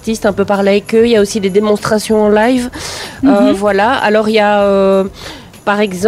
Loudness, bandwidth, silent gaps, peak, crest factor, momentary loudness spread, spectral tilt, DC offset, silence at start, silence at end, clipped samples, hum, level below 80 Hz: -11 LUFS; 15.5 kHz; none; -2 dBFS; 10 dB; 11 LU; -5 dB/octave; under 0.1%; 0.05 s; 0 s; under 0.1%; none; -40 dBFS